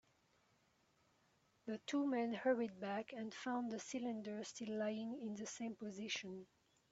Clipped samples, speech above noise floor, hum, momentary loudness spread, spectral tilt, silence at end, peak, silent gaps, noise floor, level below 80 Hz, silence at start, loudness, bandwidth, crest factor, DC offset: under 0.1%; 34 dB; none; 10 LU; -3.5 dB/octave; 0.45 s; -26 dBFS; none; -78 dBFS; -86 dBFS; 1.65 s; -44 LUFS; 8 kHz; 20 dB; under 0.1%